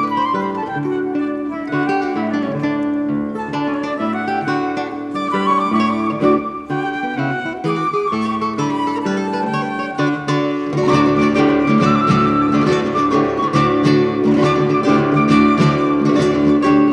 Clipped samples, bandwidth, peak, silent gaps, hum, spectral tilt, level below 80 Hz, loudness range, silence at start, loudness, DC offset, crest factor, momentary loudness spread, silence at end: under 0.1%; 10 kHz; -2 dBFS; none; none; -7 dB/octave; -46 dBFS; 6 LU; 0 s; -17 LUFS; under 0.1%; 14 dB; 8 LU; 0 s